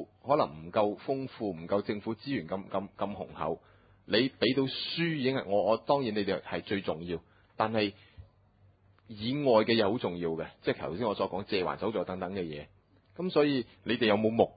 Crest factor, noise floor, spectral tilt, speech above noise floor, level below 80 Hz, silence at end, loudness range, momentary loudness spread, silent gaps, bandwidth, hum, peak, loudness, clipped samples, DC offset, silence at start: 22 dB; -63 dBFS; -9.5 dB/octave; 33 dB; -62 dBFS; 0.05 s; 4 LU; 11 LU; none; 5 kHz; none; -10 dBFS; -31 LUFS; under 0.1%; under 0.1%; 0 s